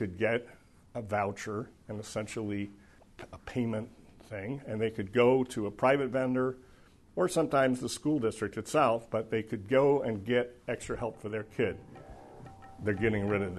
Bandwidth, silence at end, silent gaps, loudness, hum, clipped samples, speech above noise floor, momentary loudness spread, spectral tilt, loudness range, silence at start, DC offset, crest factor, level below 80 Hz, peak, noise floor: 12 kHz; 0 s; none; -31 LUFS; none; under 0.1%; 27 dB; 18 LU; -6 dB/octave; 8 LU; 0 s; under 0.1%; 20 dB; -58 dBFS; -12 dBFS; -58 dBFS